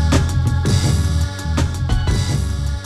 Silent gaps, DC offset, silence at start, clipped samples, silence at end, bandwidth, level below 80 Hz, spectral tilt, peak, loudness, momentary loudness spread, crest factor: none; under 0.1%; 0 s; under 0.1%; 0 s; 13.5 kHz; -22 dBFS; -5.5 dB/octave; -2 dBFS; -19 LUFS; 4 LU; 14 dB